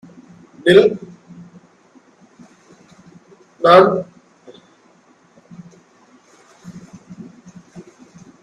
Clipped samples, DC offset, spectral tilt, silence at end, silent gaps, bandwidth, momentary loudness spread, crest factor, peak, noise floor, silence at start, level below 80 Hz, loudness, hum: under 0.1%; under 0.1%; -6 dB/octave; 0.65 s; none; 10 kHz; 29 LU; 20 dB; 0 dBFS; -53 dBFS; 0.65 s; -60 dBFS; -13 LUFS; none